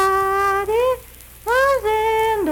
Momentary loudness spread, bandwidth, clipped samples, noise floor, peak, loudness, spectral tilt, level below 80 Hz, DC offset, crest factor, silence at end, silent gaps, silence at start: 5 LU; 19 kHz; under 0.1%; -41 dBFS; -8 dBFS; -18 LUFS; -3.5 dB/octave; -42 dBFS; under 0.1%; 12 dB; 0 s; none; 0 s